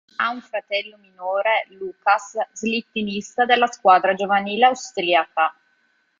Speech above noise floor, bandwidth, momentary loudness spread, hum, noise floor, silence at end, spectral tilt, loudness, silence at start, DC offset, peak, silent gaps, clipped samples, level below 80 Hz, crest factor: 44 dB; 7.6 kHz; 10 LU; none; -65 dBFS; 0.7 s; -3.5 dB/octave; -20 LUFS; 0.2 s; under 0.1%; -2 dBFS; none; under 0.1%; -68 dBFS; 20 dB